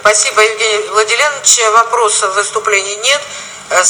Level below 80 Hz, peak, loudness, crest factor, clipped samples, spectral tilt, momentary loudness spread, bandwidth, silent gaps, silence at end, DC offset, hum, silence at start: -56 dBFS; 0 dBFS; -10 LUFS; 12 dB; 0.3%; 1.5 dB/octave; 7 LU; over 20 kHz; none; 0 s; under 0.1%; none; 0 s